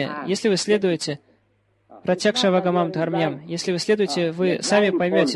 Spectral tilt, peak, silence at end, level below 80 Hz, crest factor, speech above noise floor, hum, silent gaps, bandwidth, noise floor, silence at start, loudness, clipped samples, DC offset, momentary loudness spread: -4.5 dB/octave; -4 dBFS; 0 s; -66 dBFS; 18 dB; 44 dB; none; none; 12 kHz; -65 dBFS; 0 s; -21 LUFS; under 0.1%; under 0.1%; 7 LU